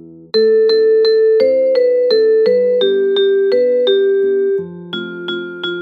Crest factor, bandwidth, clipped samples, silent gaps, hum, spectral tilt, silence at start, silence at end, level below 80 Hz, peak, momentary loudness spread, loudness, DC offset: 10 dB; 4.9 kHz; under 0.1%; none; none; -6.5 dB/octave; 0.05 s; 0 s; -72 dBFS; -2 dBFS; 11 LU; -13 LUFS; under 0.1%